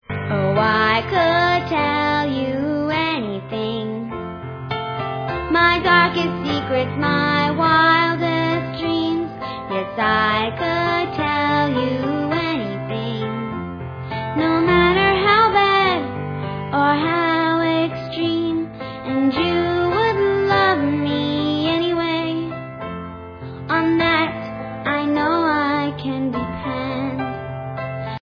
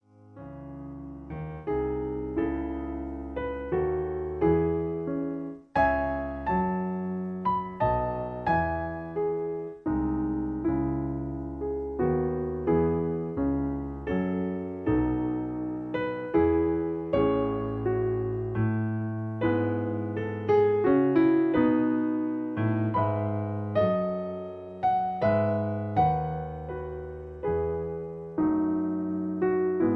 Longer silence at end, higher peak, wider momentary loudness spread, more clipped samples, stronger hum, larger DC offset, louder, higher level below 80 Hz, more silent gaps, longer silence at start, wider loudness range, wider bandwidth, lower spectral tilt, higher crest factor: about the same, 0.05 s vs 0 s; first, -2 dBFS vs -12 dBFS; about the same, 13 LU vs 11 LU; neither; neither; neither; first, -19 LUFS vs -28 LUFS; about the same, -46 dBFS vs -46 dBFS; neither; second, 0.1 s vs 0.25 s; about the same, 5 LU vs 5 LU; first, 5.4 kHz vs 4.8 kHz; second, -7 dB/octave vs -10.5 dB/octave; about the same, 18 dB vs 16 dB